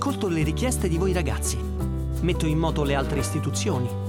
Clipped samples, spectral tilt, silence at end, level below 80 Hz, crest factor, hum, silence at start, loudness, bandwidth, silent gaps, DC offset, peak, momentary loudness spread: under 0.1%; -5.5 dB/octave; 0 s; -30 dBFS; 14 dB; none; 0 s; -25 LUFS; 17 kHz; none; under 0.1%; -10 dBFS; 4 LU